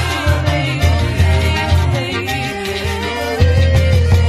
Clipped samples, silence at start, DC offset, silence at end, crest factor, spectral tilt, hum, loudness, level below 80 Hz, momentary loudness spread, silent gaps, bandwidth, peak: under 0.1%; 0 s; under 0.1%; 0 s; 14 dB; -5.5 dB/octave; none; -15 LUFS; -22 dBFS; 7 LU; none; 13.5 kHz; 0 dBFS